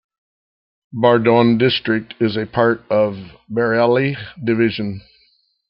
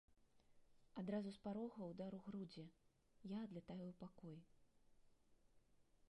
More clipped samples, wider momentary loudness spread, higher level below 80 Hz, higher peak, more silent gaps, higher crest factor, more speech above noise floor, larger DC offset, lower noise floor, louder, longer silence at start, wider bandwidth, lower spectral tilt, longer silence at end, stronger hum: neither; about the same, 12 LU vs 12 LU; first, -56 dBFS vs -80 dBFS; first, -2 dBFS vs -34 dBFS; neither; about the same, 16 dB vs 20 dB; first, 43 dB vs 23 dB; neither; second, -60 dBFS vs -75 dBFS; first, -17 LUFS vs -53 LUFS; first, 0.95 s vs 0.1 s; second, 5.8 kHz vs 11 kHz; first, -10 dB/octave vs -8 dB/octave; first, 0.7 s vs 0.05 s; neither